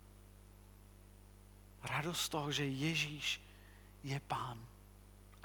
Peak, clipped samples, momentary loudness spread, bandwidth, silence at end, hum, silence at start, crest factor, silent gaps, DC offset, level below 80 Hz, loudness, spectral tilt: -24 dBFS; under 0.1%; 25 LU; 19 kHz; 0 s; 50 Hz at -60 dBFS; 0 s; 20 dB; none; under 0.1%; -62 dBFS; -39 LUFS; -3.5 dB/octave